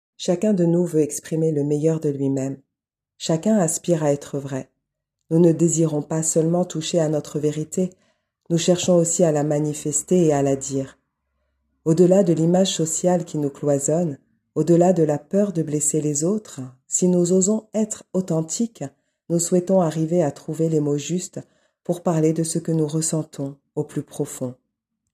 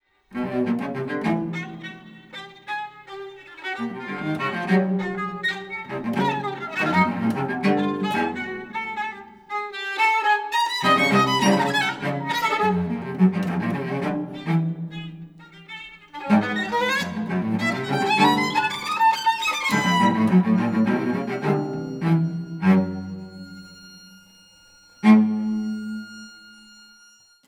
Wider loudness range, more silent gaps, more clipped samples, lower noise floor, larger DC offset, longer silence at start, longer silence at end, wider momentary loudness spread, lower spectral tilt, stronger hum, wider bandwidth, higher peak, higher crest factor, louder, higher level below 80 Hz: second, 3 LU vs 7 LU; neither; neither; first, -85 dBFS vs -54 dBFS; neither; about the same, 0.2 s vs 0.3 s; second, 0.6 s vs 0.95 s; second, 11 LU vs 19 LU; about the same, -6 dB/octave vs -5.5 dB/octave; neither; second, 14.5 kHz vs 16 kHz; about the same, -4 dBFS vs -4 dBFS; about the same, 18 dB vs 20 dB; about the same, -21 LUFS vs -22 LUFS; about the same, -64 dBFS vs -62 dBFS